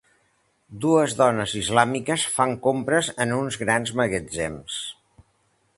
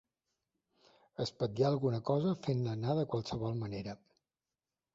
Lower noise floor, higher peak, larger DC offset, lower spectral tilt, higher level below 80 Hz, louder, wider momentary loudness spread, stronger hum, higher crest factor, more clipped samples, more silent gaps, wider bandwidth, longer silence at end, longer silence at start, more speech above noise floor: second, -67 dBFS vs under -90 dBFS; first, -2 dBFS vs -18 dBFS; neither; second, -4 dB/octave vs -7.5 dB/octave; first, -54 dBFS vs -66 dBFS; first, -23 LUFS vs -35 LUFS; about the same, 9 LU vs 11 LU; neither; about the same, 22 dB vs 18 dB; neither; neither; first, 11.5 kHz vs 7.8 kHz; second, 0.85 s vs 1 s; second, 0.7 s vs 1.2 s; second, 44 dB vs over 56 dB